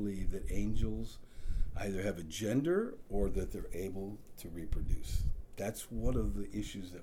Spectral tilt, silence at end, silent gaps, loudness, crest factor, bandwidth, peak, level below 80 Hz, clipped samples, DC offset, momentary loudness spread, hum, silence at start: -6 dB/octave; 0 s; none; -39 LUFS; 14 dB; 16 kHz; -20 dBFS; -40 dBFS; under 0.1%; under 0.1%; 11 LU; none; 0 s